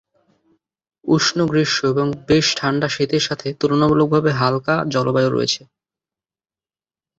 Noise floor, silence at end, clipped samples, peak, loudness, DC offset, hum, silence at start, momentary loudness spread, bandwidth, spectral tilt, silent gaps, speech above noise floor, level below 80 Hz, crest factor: under -90 dBFS; 1.6 s; under 0.1%; -2 dBFS; -18 LUFS; under 0.1%; none; 1.05 s; 6 LU; 8 kHz; -5 dB/octave; none; over 72 dB; -52 dBFS; 18 dB